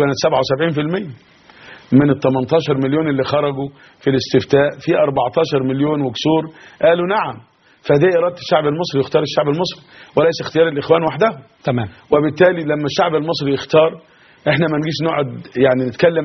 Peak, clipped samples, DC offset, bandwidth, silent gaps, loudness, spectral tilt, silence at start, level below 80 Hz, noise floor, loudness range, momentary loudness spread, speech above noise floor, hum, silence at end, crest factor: 0 dBFS; under 0.1%; under 0.1%; 6.4 kHz; none; -17 LUFS; -5 dB/octave; 0 s; -54 dBFS; -41 dBFS; 1 LU; 8 LU; 25 dB; none; 0 s; 16 dB